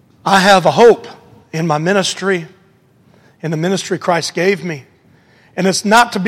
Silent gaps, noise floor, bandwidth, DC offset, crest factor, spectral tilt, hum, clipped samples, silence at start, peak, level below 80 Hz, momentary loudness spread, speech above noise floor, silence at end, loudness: none; -51 dBFS; 16 kHz; under 0.1%; 14 dB; -4.5 dB/octave; none; under 0.1%; 0.25 s; 0 dBFS; -54 dBFS; 15 LU; 38 dB; 0 s; -13 LUFS